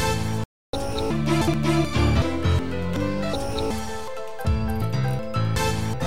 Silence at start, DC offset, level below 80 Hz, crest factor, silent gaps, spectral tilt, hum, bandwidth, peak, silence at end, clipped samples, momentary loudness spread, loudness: 0 s; 2%; -34 dBFS; 14 dB; 0.45-0.73 s; -6 dB/octave; none; 16 kHz; -8 dBFS; 0 s; under 0.1%; 9 LU; -25 LUFS